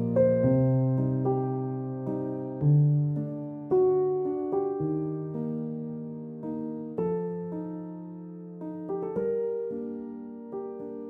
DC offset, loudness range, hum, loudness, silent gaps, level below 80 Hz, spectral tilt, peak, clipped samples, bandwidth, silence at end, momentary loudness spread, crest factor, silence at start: under 0.1%; 8 LU; none; -29 LUFS; none; -62 dBFS; -13.5 dB/octave; -12 dBFS; under 0.1%; 2.8 kHz; 0 s; 15 LU; 16 dB; 0 s